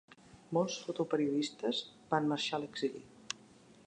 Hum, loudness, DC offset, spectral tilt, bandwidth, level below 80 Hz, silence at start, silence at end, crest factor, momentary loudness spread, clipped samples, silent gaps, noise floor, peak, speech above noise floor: none; -36 LUFS; under 0.1%; -4.5 dB/octave; 10 kHz; -78 dBFS; 0.35 s; 0.5 s; 20 dB; 12 LU; under 0.1%; none; -60 dBFS; -16 dBFS; 25 dB